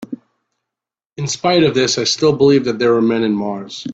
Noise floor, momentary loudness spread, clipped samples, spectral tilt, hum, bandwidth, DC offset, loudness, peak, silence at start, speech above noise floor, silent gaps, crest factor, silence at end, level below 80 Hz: -85 dBFS; 13 LU; under 0.1%; -4.5 dB/octave; none; 8.4 kHz; under 0.1%; -15 LUFS; -2 dBFS; 0 s; 70 dB; none; 14 dB; 0 s; -54 dBFS